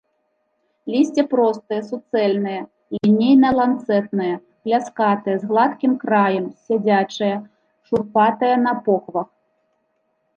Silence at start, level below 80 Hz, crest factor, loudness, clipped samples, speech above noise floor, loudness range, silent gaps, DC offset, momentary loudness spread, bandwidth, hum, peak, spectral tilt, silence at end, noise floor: 0.85 s; -60 dBFS; 16 dB; -19 LUFS; under 0.1%; 51 dB; 2 LU; none; under 0.1%; 10 LU; 7.6 kHz; none; -4 dBFS; -7 dB/octave; 1.1 s; -69 dBFS